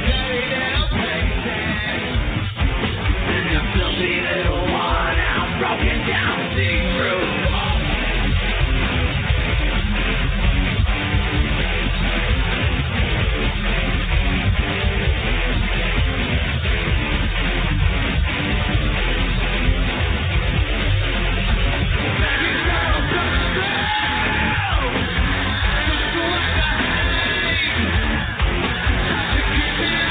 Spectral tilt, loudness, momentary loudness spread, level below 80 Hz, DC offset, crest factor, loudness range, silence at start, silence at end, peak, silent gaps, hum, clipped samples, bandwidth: -8 dB/octave; -20 LUFS; 2 LU; -22 dBFS; under 0.1%; 14 dB; 1 LU; 0 s; 0 s; -4 dBFS; none; none; under 0.1%; 4.7 kHz